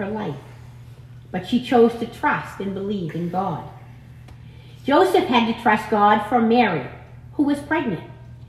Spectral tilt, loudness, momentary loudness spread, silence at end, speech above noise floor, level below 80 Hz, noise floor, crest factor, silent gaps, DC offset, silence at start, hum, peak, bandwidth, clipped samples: -6.5 dB/octave; -20 LUFS; 16 LU; 0 s; 22 dB; -52 dBFS; -42 dBFS; 18 dB; none; under 0.1%; 0 s; none; -4 dBFS; 13.5 kHz; under 0.1%